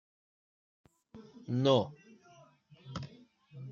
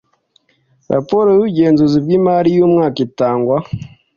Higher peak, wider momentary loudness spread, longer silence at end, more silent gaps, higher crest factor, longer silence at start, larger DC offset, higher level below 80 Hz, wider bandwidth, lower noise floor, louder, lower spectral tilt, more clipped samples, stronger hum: second, -12 dBFS vs 0 dBFS; first, 27 LU vs 8 LU; second, 0 s vs 0.3 s; neither; first, 24 dB vs 14 dB; first, 1.15 s vs 0.9 s; neither; second, -72 dBFS vs -48 dBFS; about the same, 7.2 kHz vs 7 kHz; about the same, -61 dBFS vs -58 dBFS; second, -32 LUFS vs -13 LUFS; second, -7 dB/octave vs -9 dB/octave; neither; neither